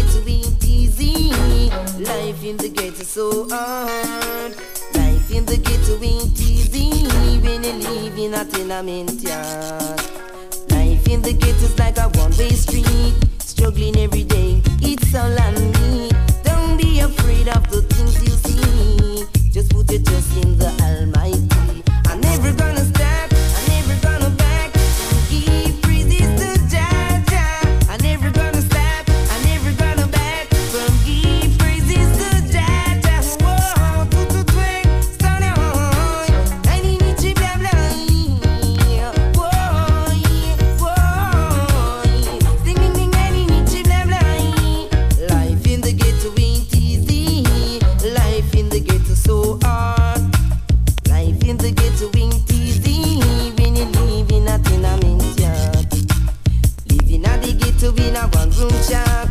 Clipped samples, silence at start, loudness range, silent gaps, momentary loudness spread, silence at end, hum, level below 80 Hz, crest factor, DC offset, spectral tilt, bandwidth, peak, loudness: under 0.1%; 0 s; 4 LU; none; 5 LU; 0 s; none; -16 dBFS; 12 dB; under 0.1%; -5.5 dB/octave; 16 kHz; -4 dBFS; -17 LUFS